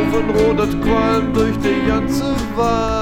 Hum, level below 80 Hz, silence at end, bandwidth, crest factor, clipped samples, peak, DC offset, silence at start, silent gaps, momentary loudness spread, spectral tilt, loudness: none; -28 dBFS; 0 s; 16.5 kHz; 12 dB; under 0.1%; -4 dBFS; under 0.1%; 0 s; none; 3 LU; -6.5 dB/octave; -17 LUFS